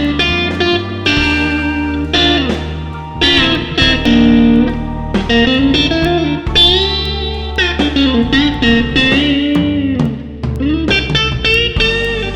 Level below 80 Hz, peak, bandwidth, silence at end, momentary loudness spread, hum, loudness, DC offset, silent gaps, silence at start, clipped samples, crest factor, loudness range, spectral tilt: -26 dBFS; 0 dBFS; 11 kHz; 0 s; 9 LU; none; -12 LUFS; under 0.1%; none; 0 s; under 0.1%; 12 dB; 2 LU; -5.5 dB/octave